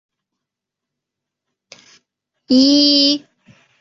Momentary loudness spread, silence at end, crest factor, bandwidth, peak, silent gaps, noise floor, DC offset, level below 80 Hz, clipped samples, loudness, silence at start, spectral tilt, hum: 7 LU; 0.65 s; 18 dB; 7.8 kHz; -2 dBFS; none; -83 dBFS; under 0.1%; -64 dBFS; under 0.1%; -12 LUFS; 2.5 s; -2.5 dB/octave; none